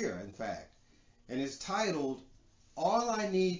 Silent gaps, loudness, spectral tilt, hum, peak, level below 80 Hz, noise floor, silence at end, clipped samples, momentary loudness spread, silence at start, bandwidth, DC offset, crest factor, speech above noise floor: none; -35 LUFS; -4.5 dB/octave; none; -18 dBFS; -64 dBFS; -64 dBFS; 0 s; under 0.1%; 13 LU; 0 s; 7.6 kHz; under 0.1%; 18 dB; 31 dB